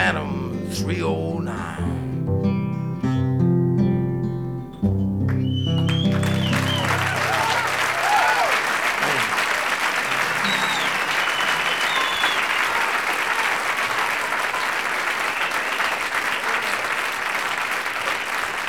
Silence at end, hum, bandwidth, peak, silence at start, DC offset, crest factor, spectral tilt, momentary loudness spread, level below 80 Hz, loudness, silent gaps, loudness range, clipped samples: 0 s; none; 18.5 kHz; -4 dBFS; 0 s; 0.3%; 18 dB; -4.5 dB/octave; 6 LU; -50 dBFS; -21 LUFS; none; 3 LU; under 0.1%